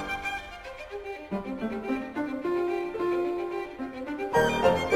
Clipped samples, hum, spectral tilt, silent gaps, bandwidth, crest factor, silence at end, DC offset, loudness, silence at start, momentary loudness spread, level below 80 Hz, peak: under 0.1%; none; -5.5 dB/octave; none; 16 kHz; 20 dB; 0 s; under 0.1%; -30 LUFS; 0 s; 13 LU; -52 dBFS; -10 dBFS